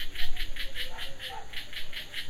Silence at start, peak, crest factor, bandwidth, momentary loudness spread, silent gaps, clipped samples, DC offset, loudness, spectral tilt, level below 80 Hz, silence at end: 0 s; -12 dBFS; 14 dB; 15 kHz; 3 LU; none; under 0.1%; under 0.1%; -37 LUFS; -2 dB/octave; -36 dBFS; 0 s